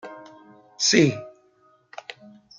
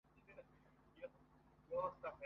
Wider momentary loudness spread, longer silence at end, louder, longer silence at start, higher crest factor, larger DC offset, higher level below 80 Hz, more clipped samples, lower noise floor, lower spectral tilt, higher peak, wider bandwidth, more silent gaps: first, 26 LU vs 19 LU; first, 0.45 s vs 0 s; first, -20 LUFS vs -48 LUFS; about the same, 0.05 s vs 0.15 s; about the same, 22 dB vs 20 dB; neither; first, -68 dBFS vs -76 dBFS; neither; second, -60 dBFS vs -70 dBFS; second, -3.5 dB/octave vs -5 dB/octave; first, -4 dBFS vs -30 dBFS; first, 10.5 kHz vs 6 kHz; neither